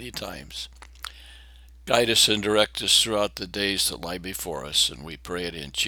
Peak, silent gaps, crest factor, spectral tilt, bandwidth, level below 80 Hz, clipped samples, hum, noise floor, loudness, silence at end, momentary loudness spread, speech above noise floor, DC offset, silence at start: -4 dBFS; none; 24 dB; -1.5 dB/octave; over 20 kHz; -48 dBFS; under 0.1%; none; -48 dBFS; -23 LUFS; 0 s; 21 LU; 23 dB; under 0.1%; 0 s